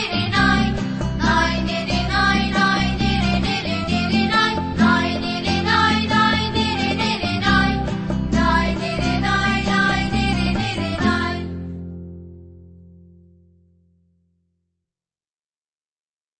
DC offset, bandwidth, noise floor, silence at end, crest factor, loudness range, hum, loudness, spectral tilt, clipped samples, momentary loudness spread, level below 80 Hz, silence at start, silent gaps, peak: under 0.1%; 8.8 kHz; under -90 dBFS; 3.8 s; 18 dB; 8 LU; none; -19 LUFS; -5 dB/octave; under 0.1%; 7 LU; -32 dBFS; 0 s; none; -4 dBFS